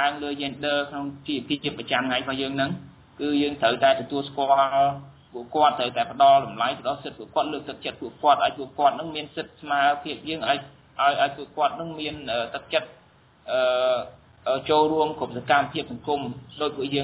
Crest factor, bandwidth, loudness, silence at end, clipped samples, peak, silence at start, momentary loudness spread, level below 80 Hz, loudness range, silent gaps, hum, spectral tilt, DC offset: 20 dB; 4 kHz; -24 LUFS; 0 s; under 0.1%; -6 dBFS; 0 s; 12 LU; -60 dBFS; 4 LU; none; none; -8.5 dB/octave; under 0.1%